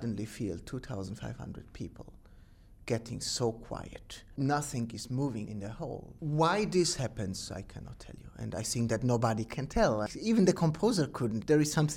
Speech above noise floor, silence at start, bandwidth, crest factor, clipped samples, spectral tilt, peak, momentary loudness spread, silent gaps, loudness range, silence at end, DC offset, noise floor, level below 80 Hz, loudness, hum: 24 dB; 0 s; 16.5 kHz; 20 dB; under 0.1%; -5.5 dB/octave; -14 dBFS; 18 LU; none; 8 LU; 0 s; under 0.1%; -56 dBFS; -52 dBFS; -32 LUFS; none